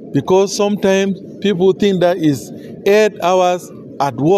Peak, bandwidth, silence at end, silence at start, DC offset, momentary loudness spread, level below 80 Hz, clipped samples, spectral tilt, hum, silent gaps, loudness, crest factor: -2 dBFS; 14.5 kHz; 0 s; 0 s; under 0.1%; 8 LU; -56 dBFS; under 0.1%; -5.5 dB/octave; none; none; -15 LUFS; 14 dB